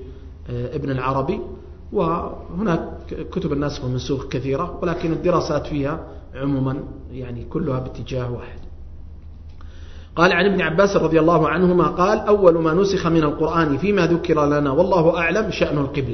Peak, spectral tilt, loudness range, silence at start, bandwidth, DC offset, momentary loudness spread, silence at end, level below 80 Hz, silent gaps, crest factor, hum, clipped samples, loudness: 0 dBFS; -7 dB/octave; 10 LU; 0 s; 6.4 kHz; under 0.1%; 16 LU; 0 s; -38 dBFS; none; 20 dB; none; under 0.1%; -20 LUFS